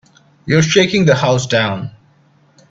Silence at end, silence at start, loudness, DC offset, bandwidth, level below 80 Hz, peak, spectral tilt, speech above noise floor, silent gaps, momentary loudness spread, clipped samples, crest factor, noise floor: 0.8 s; 0.45 s; -13 LUFS; under 0.1%; 8 kHz; -48 dBFS; 0 dBFS; -5 dB/octave; 39 dB; none; 16 LU; under 0.1%; 16 dB; -52 dBFS